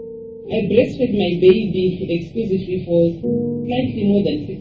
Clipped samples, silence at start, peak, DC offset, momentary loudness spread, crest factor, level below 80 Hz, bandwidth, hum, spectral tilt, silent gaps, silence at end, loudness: under 0.1%; 0 s; -2 dBFS; under 0.1%; 9 LU; 16 dB; -44 dBFS; 6.8 kHz; none; -9 dB/octave; none; 0 s; -18 LUFS